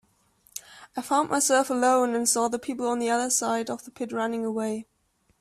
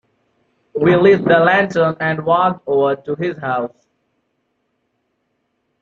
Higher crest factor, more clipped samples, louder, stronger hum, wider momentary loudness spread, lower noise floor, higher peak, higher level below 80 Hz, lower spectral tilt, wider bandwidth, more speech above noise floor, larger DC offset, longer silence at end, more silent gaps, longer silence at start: about the same, 16 dB vs 16 dB; neither; second, -25 LUFS vs -15 LUFS; neither; first, 15 LU vs 11 LU; about the same, -69 dBFS vs -69 dBFS; second, -10 dBFS vs -2 dBFS; second, -70 dBFS vs -58 dBFS; second, -2.5 dB/octave vs -7.5 dB/octave; first, 15.5 kHz vs 7.2 kHz; second, 43 dB vs 54 dB; neither; second, 0.6 s vs 2.15 s; neither; second, 0.55 s vs 0.75 s